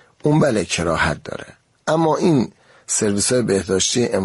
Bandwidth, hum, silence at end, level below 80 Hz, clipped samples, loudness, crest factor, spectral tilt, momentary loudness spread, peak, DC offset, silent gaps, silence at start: 11.5 kHz; none; 0 s; -44 dBFS; under 0.1%; -18 LUFS; 14 dB; -4 dB/octave; 12 LU; -4 dBFS; under 0.1%; none; 0.25 s